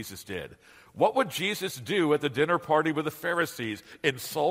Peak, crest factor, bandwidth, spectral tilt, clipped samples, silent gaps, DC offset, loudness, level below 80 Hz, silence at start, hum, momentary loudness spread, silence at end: -8 dBFS; 20 dB; 16 kHz; -4.5 dB/octave; under 0.1%; none; under 0.1%; -28 LUFS; -66 dBFS; 0 s; none; 12 LU; 0 s